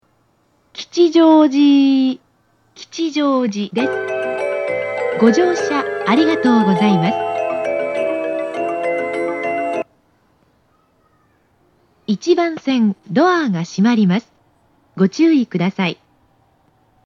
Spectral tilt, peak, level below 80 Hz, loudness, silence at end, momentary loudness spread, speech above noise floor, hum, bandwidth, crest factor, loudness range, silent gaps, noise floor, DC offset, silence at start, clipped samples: -6.5 dB/octave; 0 dBFS; -68 dBFS; -16 LUFS; 1.15 s; 10 LU; 45 dB; none; 8.8 kHz; 16 dB; 8 LU; none; -60 dBFS; under 0.1%; 0.75 s; under 0.1%